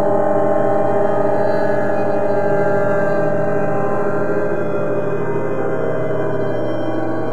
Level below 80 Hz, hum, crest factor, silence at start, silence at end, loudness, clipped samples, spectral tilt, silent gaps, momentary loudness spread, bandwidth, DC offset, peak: -52 dBFS; none; 14 dB; 0 s; 0 s; -18 LUFS; under 0.1%; -8.5 dB/octave; none; 4 LU; 9.6 kHz; 10%; -2 dBFS